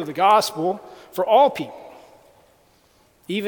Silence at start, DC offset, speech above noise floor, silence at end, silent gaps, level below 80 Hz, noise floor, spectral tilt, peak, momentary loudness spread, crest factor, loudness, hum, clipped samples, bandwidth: 0 s; under 0.1%; 38 dB; 0 s; none; -68 dBFS; -58 dBFS; -4 dB/octave; -4 dBFS; 17 LU; 18 dB; -19 LUFS; none; under 0.1%; 19 kHz